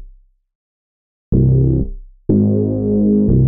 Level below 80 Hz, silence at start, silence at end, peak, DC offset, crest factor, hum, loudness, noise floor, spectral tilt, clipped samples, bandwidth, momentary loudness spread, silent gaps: -26 dBFS; 0 s; 0 s; -4 dBFS; under 0.1%; 12 dB; none; -15 LUFS; -44 dBFS; -18.5 dB/octave; under 0.1%; 1.3 kHz; 7 LU; 0.55-1.32 s